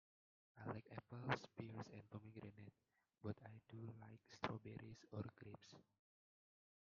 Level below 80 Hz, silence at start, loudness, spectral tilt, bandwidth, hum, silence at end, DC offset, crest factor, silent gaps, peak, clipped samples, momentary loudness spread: -82 dBFS; 0.55 s; -54 LUFS; -5 dB/octave; 7.2 kHz; none; 1 s; under 0.1%; 32 dB; none; -24 dBFS; under 0.1%; 15 LU